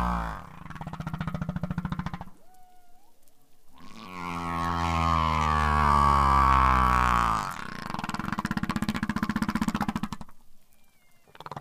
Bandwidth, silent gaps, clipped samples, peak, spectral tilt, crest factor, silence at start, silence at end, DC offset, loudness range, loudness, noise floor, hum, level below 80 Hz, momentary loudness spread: 15.5 kHz; none; under 0.1%; -6 dBFS; -5.5 dB/octave; 22 dB; 0 s; 0 s; under 0.1%; 14 LU; -26 LUFS; -56 dBFS; none; -36 dBFS; 20 LU